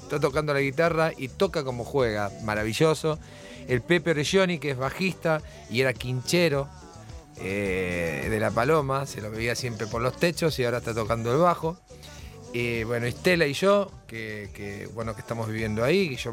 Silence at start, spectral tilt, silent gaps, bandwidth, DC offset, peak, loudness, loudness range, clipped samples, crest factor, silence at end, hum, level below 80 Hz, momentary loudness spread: 0 s; -5.5 dB/octave; none; 16.5 kHz; under 0.1%; -8 dBFS; -26 LUFS; 2 LU; under 0.1%; 18 dB; 0 s; none; -48 dBFS; 14 LU